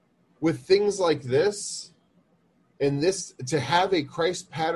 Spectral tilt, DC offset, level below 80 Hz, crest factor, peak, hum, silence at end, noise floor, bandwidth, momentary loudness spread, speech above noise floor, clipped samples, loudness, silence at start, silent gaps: -4.5 dB/octave; under 0.1%; -62 dBFS; 20 dB; -6 dBFS; none; 0 s; -65 dBFS; 12 kHz; 10 LU; 40 dB; under 0.1%; -25 LUFS; 0.4 s; none